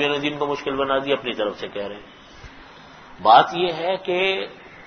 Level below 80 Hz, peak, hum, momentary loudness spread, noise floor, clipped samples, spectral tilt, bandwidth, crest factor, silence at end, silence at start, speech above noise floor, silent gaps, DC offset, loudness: -56 dBFS; -2 dBFS; none; 16 LU; -44 dBFS; under 0.1%; -5 dB/octave; 6.6 kHz; 22 dB; 0 s; 0 s; 23 dB; none; under 0.1%; -21 LUFS